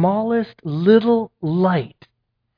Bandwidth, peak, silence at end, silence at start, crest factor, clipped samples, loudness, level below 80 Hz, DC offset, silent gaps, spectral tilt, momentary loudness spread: 5.2 kHz; -2 dBFS; 0.7 s; 0 s; 16 dB; under 0.1%; -18 LUFS; -60 dBFS; under 0.1%; none; -10.5 dB/octave; 9 LU